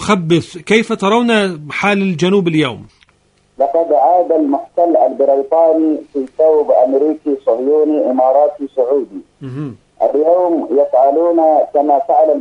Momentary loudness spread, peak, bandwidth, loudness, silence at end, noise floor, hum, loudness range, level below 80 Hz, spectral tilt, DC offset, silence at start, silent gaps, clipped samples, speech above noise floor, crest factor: 7 LU; 0 dBFS; 11 kHz; -13 LUFS; 0 s; -55 dBFS; none; 2 LU; -56 dBFS; -6 dB/octave; under 0.1%; 0 s; none; under 0.1%; 42 dB; 14 dB